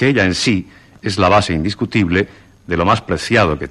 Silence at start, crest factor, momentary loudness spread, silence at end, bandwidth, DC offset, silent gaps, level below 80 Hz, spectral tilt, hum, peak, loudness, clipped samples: 0 s; 14 dB; 9 LU; 0 s; 12 kHz; under 0.1%; none; -38 dBFS; -5.5 dB/octave; none; -2 dBFS; -16 LUFS; under 0.1%